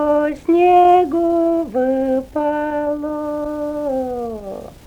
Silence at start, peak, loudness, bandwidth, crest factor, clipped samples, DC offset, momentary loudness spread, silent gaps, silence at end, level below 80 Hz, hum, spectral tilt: 0 s; -2 dBFS; -17 LUFS; 9.8 kHz; 14 dB; under 0.1%; under 0.1%; 12 LU; none; 0.15 s; -46 dBFS; none; -7 dB/octave